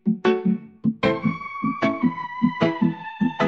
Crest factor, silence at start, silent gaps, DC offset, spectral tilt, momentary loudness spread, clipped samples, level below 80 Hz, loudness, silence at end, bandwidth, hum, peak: 18 dB; 0.05 s; none; 0.1%; -8 dB/octave; 5 LU; under 0.1%; -58 dBFS; -23 LUFS; 0 s; 7.2 kHz; none; -6 dBFS